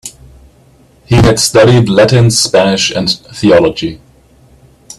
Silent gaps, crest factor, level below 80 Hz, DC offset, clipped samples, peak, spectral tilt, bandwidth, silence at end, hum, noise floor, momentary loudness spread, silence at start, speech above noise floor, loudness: none; 10 dB; -32 dBFS; under 0.1%; under 0.1%; 0 dBFS; -4.5 dB/octave; 13 kHz; 1.05 s; none; -45 dBFS; 8 LU; 0.05 s; 36 dB; -9 LUFS